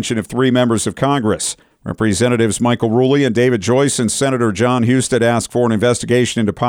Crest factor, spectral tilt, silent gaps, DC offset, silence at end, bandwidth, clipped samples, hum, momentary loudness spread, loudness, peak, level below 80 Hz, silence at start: 12 dB; -5 dB/octave; none; under 0.1%; 0 s; 16.5 kHz; under 0.1%; none; 4 LU; -15 LUFS; -4 dBFS; -46 dBFS; 0 s